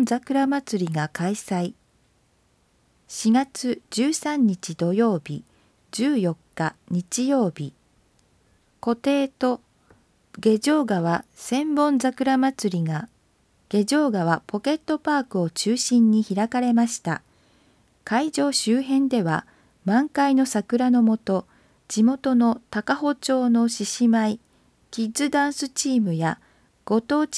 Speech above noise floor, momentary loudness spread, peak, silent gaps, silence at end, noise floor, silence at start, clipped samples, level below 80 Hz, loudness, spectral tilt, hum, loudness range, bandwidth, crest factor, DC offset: 42 dB; 9 LU; -6 dBFS; none; 0 s; -64 dBFS; 0 s; under 0.1%; -66 dBFS; -23 LUFS; -5 dB/octave; none; 5 LU; 11 kHz; 18 dB; under 0.1%